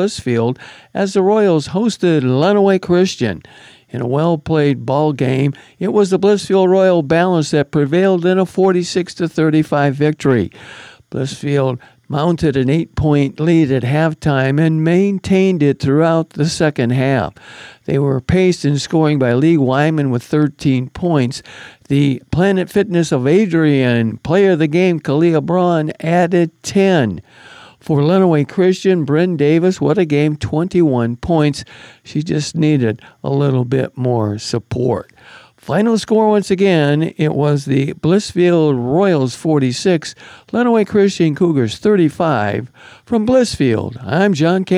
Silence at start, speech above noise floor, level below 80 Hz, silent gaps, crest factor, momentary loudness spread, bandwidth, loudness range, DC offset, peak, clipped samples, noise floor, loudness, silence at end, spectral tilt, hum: 0 s; 28 dB; -44 dBFS; none; 12 dB; 8 LU; 12 kHz; 3 LU; under 0.1%; -2 dBFS; under 0.1%; -42 dBFS; -15 LUFS; 0 s; -7 dB/octave; none